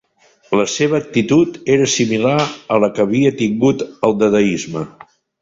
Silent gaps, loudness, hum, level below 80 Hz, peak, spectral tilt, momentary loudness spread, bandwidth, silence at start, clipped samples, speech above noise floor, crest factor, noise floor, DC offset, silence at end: none; -16 LUFS; none; -52 dBFS; 0 dBFS; -5 dB/octave; 5 LU; 7.8 kHz; 0.5 s; under 0.1%; 38 dB; 16 dB; -53 dBFS; under 0.1%; 0.5 s